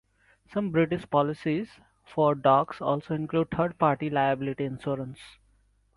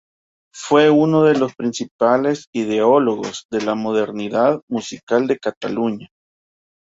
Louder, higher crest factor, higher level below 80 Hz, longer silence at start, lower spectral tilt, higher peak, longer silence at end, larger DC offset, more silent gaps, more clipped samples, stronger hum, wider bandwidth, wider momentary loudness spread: second, -27 LUFS vs -18 LUFS; about the same, 20 dB vs 18 dB; about the same, -60 dBFS vs -62 dBFS; about the same, 0.5 s vs 0.55 s; first, -8.5 dB/octave vs -5.5 dB/octave; second, -8 dBFS vs 0 dBFS; second, 0.65 s vs 0.8 s; neither; second, none vs 1.91-1.99 s, 2.47-2.53 s, 3.45-3.49 s, 4.62-4.68 s, 5.03-5.07 s, 5.57-5.61 s; neither; neither; first, 11.5 kHz vs 8 kHz; about the same, 11 LU vs 11 LU